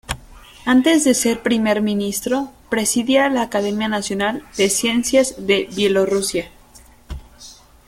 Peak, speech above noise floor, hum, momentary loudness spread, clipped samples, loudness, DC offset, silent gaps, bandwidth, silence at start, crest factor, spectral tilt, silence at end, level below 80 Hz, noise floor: -2 dBFS; 29 dB; none; 13 LU; under 0.1%; -18 LUFS; under 0.1%; none; 16.5 kHz; 0.1 s; 16 dB; -3.5 dB/octave; 0.35 s; -44 dBFS; -46 dBFS